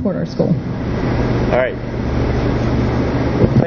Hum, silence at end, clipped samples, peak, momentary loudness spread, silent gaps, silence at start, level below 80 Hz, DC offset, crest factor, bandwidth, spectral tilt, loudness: none; 0 s; under 0.1%; 0 dBFS; 4 LU; none; 0 s; -26 dBFS; under 0.1%; 16 dB; 6.6 kHz; -8.5 dB/octave; -18 LUFS